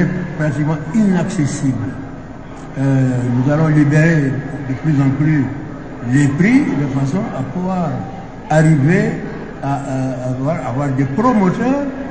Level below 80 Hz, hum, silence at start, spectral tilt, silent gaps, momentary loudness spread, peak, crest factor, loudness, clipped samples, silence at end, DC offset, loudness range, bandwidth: -40 dBFS; none; 0 s; -8 dB/octave; none; 13 LU; 0 dBFS; 16 dB; -16 LUFS; under 0.1%; 0 s; 1%; 2 LU; 8 kHz